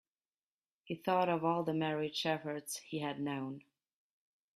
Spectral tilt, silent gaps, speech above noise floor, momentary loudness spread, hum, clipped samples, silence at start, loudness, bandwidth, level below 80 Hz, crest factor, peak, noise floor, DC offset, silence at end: -5 dB/octave; none; over 54 dB; 10 LU; none; under 0.1%; 0.85 s; -36 LUFS; 14.5 kHz; -80 dBFS; 18 dB; -20 dBFS; under -90 dBFS; under 0.1%; 0.95 s